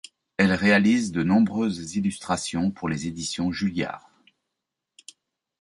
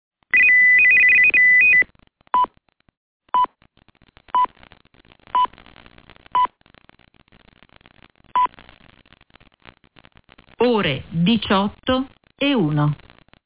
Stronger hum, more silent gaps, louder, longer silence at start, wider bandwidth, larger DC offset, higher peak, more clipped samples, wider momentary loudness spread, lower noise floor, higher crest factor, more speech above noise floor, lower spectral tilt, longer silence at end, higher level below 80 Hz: neither; second, none vs 2.97-3.20 s; second, -24 LUFS vs -16 LUFS; about the same, 0.4 s vs 0.35 s; first, 11.5 kHz vs 4 kHz; neither; about the same, -6 dBFS vs -6 dBFS; neither; second, 11 LU vs 15 LU; first, -84 dBFS vs -59 dBFS; first, 20 dB vs 14 dB; first, 61 dB vs 40 dB; second, -5 dB/octave vs -8 dB/octave; first, 1.6 s vs 0.5 s; about the same, -52 dBFS vs -52 dBFS